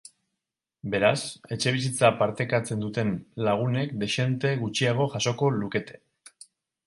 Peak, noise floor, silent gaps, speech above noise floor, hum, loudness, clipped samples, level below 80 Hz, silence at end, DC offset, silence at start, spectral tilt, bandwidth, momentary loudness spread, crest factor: -4 dBFS; -86 dBFS; none; 60 dB; none; -26 LUFS; under 0.1%; -62 dBFS; 0.95 s; under 0.1%; 0.85 s; -5 dB/octave; 11.5 kHz; 9 LU; 22 dB